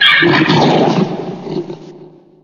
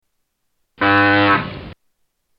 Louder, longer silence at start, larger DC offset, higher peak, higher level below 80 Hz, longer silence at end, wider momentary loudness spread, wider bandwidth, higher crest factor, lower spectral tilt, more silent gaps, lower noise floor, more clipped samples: first, -12 LUFS vs -15 LUFS; second, 0 s vs 0.8 s; neither; about the same, 0 dBFS vs -2 dBFS; second, -54 dBFS vs -48 dBFS; second, 0.4 s vs 0.65 s; about the same, 16 LU vs 17 LU; first, 10.5 kHz vs 5.6 kHz; about the same, 14 dB vs 18 dB; second, -5.5 dB/octave vs -7.5 dB/octave; neither; second, -39 dBFS vs -71 dBFS; neither